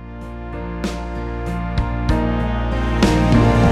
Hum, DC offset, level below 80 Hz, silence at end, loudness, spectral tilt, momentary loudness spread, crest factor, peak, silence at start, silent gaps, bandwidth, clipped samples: none; under 0.1%; -24 dBFS; 0 s; -19 LUFS; -7 dB/octave; 15 LU; 16 dB; -2 dBFS; 0 s; none; 12.5 kHz; under 0.1%